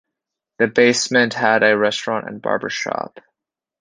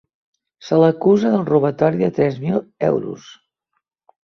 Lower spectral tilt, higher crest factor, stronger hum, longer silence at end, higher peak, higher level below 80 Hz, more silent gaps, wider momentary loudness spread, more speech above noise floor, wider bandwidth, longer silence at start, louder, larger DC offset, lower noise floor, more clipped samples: second, -3.5 dB/octave vs -8.5 dB/octave; about the same, 18 dB vs 16 dB; neither; second, 0.6 s vs 0.9 s; about the same, -2 dBFS vs -2 dBFS; second, -64 dBFS vs -58 dBFS; neither; about the same, 10 LU vs 8 LU; first, 66 dB vs 57 dB; first, 10 kHz vs 6.8 kHz; about the same, 0.6 s vs 0.65 s; about the same, -18 LUFS vs -17 LUFS; neither; first, -84 dBFS vs -74 dBFS; neither